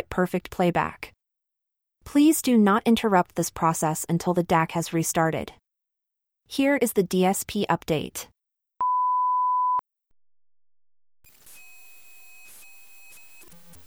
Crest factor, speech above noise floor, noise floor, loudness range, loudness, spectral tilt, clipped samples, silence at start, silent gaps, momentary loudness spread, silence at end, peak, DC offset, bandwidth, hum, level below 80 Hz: 18 dB; 61 dB; -84 dBFS; 5 LU; -24 LUFS; -5 dB/octave; under 0.1%; 0 s; none; 11 LU; 0.4 s; -8 dBFS; under 0.1%; over 20 kHz; none; -56 dBFS